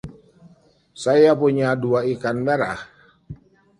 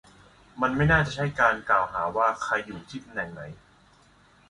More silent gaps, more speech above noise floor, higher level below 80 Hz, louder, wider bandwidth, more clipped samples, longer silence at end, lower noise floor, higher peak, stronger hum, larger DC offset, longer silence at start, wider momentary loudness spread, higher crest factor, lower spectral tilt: neither; about the same, 35 dB vs 32 dB; second, -56 dBFS vs -46 dBFS; first, -19 LUFS vs -25 LUFS; about the same, 11 kHz vs 11 kHz; neither; second, 0.45 s vs 0.95 s; second, -54 dBFS vs -58 dBFS; first, -4 dBFS vs -8 dBFS; neither; neither; second, 0.05 s vs 0.55 s; second, 12 LU vs 17 LU; about the same, 18 dB vs 20 dB; about the same, -6.5 dB/octave vs -6 dB/octave